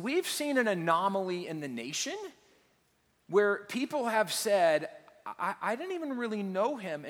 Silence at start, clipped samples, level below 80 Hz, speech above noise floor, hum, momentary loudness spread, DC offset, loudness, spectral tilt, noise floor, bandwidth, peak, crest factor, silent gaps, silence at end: 0 s; under 0.1%; -82 dBFS; 41 dB; none; 10 LU; under 0.1%; -31 LUFS; -3.5 dB/octave; -71 dBFS; over 20 kHz; -12 dBFS; 20 dB; none; 0 s